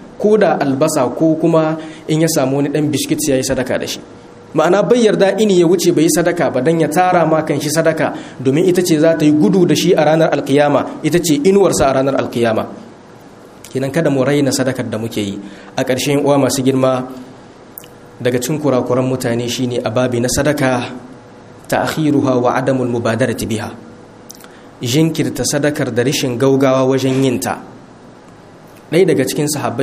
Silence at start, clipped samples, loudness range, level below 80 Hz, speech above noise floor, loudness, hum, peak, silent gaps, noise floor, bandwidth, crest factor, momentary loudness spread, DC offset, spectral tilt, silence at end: 0 s; under 0.1%; 5 LU; -46 dBFS; 25 dB; -14 LUFS; none; 0 dBFS; none; -39 dBFS; 15.5 kHz; 14 dB; 10 LU; under 0.1%; -5 dB/octave; 0 s